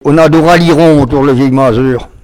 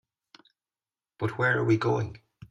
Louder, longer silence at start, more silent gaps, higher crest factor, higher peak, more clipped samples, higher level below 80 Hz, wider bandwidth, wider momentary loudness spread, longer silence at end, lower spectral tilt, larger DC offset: first, -7 LUFS vs -27 LUFS; second, 0.05 s vs 1.2 s; neither; second, 6 dB vs 18 dB; first, 0 dBFS vs -12 dBFS; first, 2% vs under 0.1%; first, -30 dBFS vs -62 dBFS; first, 16 kHz vs 7.8 kHz; second, 4 LU vs 10 LU; about the same, 0.15 s vs 0.05 s; about the same, -7 dB/octave vs -7.5 dB/octave; neither